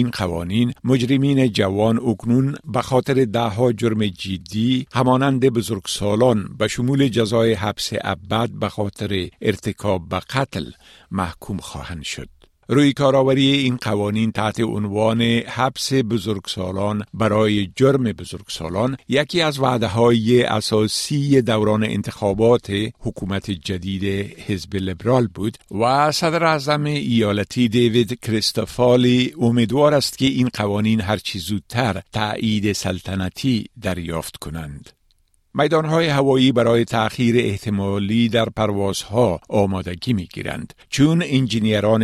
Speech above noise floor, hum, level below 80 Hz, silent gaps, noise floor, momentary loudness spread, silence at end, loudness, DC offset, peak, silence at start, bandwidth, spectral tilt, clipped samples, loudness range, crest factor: 42 dB; none; -48 dBFS; none; -61 dBFS; 10 LU; 0 s; -19 LUFS; under 0.1%; -2 dBFS; 0 s; 13.5 kHz; -6 dB/octave; under 0.1%; 5 LU; 16 dB